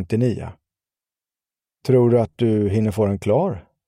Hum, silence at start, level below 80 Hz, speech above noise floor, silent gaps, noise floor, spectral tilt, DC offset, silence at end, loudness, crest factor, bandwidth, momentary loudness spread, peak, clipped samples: none; 0 s; -50 dBFS; over 71 dB; none; under -90 dBFS; -9 dB/octave; under 0.1%; 0.25 s; -19 LUFS; 16 dB; 12.5 kHz; 13 LU; -4 dBFS; under 0.1%